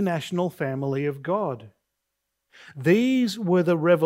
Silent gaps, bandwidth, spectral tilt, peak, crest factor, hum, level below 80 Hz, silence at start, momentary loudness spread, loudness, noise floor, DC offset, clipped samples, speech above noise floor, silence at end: none; 16 kHz; -7 dB/octave; -6 dBFS; 18 dB; none; -72 dBFS; 0 s; 9 LU; -24 LUFS; -80 dBFS; under 0.1%; under 0.1%; 57 dB; 0 s